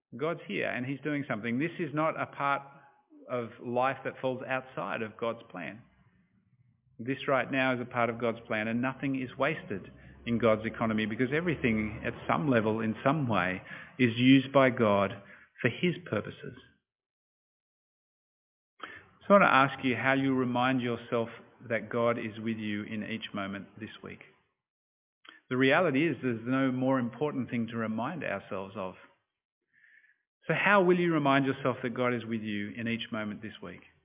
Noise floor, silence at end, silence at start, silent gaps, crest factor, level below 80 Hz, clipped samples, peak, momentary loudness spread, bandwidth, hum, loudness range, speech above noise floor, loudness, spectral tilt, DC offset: -68 dBFS; 0.25 s; 0.1 s; 16.95-16.99 s, 17.06-18.77 s, 24.70-25.21 s, 29.45-29.61 s, 30.27-30.41 s; 24 dB; -64 dBFS; under 0.1%; -8 dBFS; 17 LU; 3.9 kHz; none; 9 LU; 38 dB; -30 LUFS; -4.5 dB/octave; under 0.1%